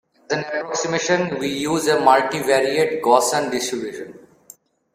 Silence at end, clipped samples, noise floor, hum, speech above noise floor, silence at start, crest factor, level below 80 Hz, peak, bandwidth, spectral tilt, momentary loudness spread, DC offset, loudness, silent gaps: 0.8 s; under 0.1%; -49 dBFS; none; 30 dB; 0.3 s; 20 dB; -62 dBFS; 0 dBFS; 16 kHz; -3.5 dB/octave; 10 LU; under 0.1%; -19 LUFS; none